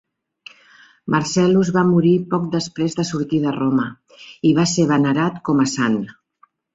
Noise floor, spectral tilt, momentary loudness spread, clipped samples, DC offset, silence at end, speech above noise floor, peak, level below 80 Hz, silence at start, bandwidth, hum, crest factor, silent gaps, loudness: -58 dBFS; -6 dB/octave; 7 LU; under 0.1%; under 0.1%; 0.6 s; 40 dB; -4 dBFS; -56 dBFS; 1.05 s; 8 kHz; none; 16 dB; none; -18 LUFS